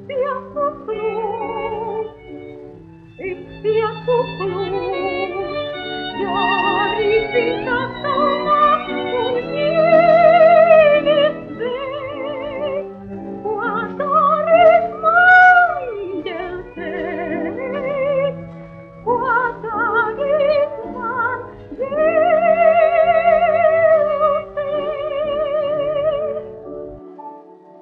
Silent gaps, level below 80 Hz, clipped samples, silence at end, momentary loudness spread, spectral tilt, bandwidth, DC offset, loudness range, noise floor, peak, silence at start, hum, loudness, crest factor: none; -50 dBFS; under 0.1%; 0.3 s; 18 LU; -7 dB/octave; 5.4 kHz; under 0.1%; 10 LU; -41 dBFS; -2 dBFS; 0 s; none; -17 LUFS; 16 dB